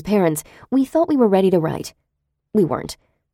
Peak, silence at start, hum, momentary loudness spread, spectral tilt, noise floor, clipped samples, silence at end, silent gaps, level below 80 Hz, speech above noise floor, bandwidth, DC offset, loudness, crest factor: -4 dBFS; 0 s; none; 16 LU; -6.5 dB/octave; -75 dBFS; under 0.1%; 0.4 s; none; -52 dBFS; 57 dB; 16.5 kHz; under 0.1%; -19 LUFS; 16 dB